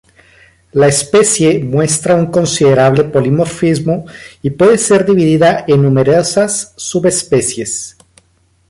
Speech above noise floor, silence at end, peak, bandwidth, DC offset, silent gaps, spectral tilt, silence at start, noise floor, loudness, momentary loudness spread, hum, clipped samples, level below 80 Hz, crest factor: 43 dB; 0.8 s; 0 dBFS; 11.5 kHz; under 0.1%; none; -5 dB/octave; 0.75 s; -54 dBFS; -11 LUFS; 10 LU; none; under 0.1%; -46 dBFS; 12 dB